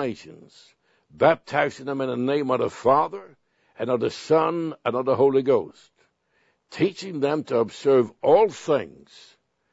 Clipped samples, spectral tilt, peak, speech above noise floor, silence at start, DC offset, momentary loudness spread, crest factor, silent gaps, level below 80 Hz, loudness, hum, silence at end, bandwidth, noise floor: under 0.1%; -6.5 dB/octave; -4 dBFS; 45 dB; 0 s; under 0.1%; 10 LU; 20 dB; none; -66 dBFS; -23 LUFS; none; 0.85 s; 8 kHz; -68 dBFS